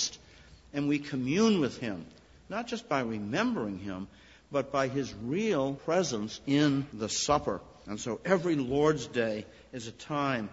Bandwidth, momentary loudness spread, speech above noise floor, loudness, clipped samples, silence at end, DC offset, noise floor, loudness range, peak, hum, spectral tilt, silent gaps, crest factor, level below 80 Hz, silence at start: 8 kHz; 13 LU; 25 dB; -31 LUFS; under 0.1%; 0 s; under 0.1%; -55 dBFS; 4 LU; -10 dBFS; none; -5 dB/octave; none; 22 dB; -60 dBFS; 0 s